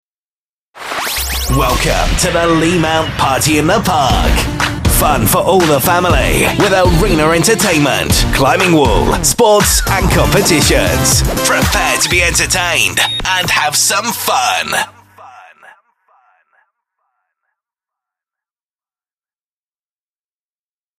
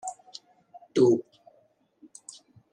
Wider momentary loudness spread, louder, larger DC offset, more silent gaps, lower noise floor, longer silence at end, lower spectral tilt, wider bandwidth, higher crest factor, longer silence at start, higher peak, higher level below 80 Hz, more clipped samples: second, 5 LU vs 25 LU; first, -11 LUFS vs -25 LUFS; neither; neither; first, under -90 dBFS vs -66 dBFS; first, 5.6 s vs 1.5 s; second, -3.5 dB/octave vs -6 dB/octave; first, 15.5 kHz vs 10.5 kHz; second, 14 dB vs 20 dB; first, 0.75 s vs 0.05 s; first, 0 dBFS vs -10 dBFS; first, -24 dBFS vs -82 dBFS; neither